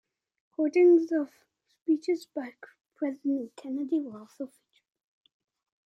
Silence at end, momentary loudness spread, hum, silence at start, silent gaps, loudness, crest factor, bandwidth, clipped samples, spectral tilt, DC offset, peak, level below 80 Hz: 1.4 s; 21 LU; none; 0.6 s; 1.82-1.86 s; -28 LUFS; 16 dB; 8.6 kHz; under 0.1%; -6 dB/octave; under 0.1%; -14 dBFS; -88 dBFS